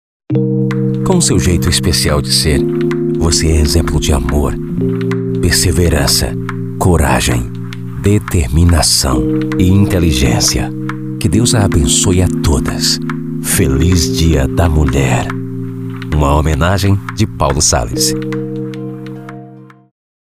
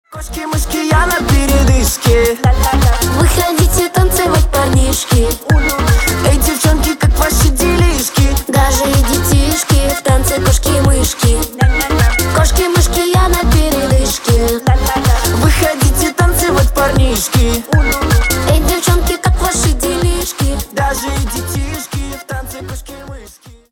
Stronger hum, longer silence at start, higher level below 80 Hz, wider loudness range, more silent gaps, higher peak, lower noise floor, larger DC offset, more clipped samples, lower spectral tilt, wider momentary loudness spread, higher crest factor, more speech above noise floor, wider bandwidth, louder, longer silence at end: neither; first, 0.3 s vs 0.1 s; second, -22 dBFS vs -16 dBFS; about the same, 2 LU vs 3 LU; neither; about the same, 0 dBFS vs 0 dBFS; about the same, -36 dBFS vs -38 dBFS; first, 1% vs 0.1%; neither; about the same, -4.5 dB/octave vs -4.5 dB/octave; first, 11 LU vs 7 LU; about the same, 12 dB vs 12 dB; about the same, 24 dB vs 27 dB; second, 16 kHz vs 18.5 kHz; about the same, -13 LUFS vs -12 LUFS; first, 0.65 s vs 0.2 s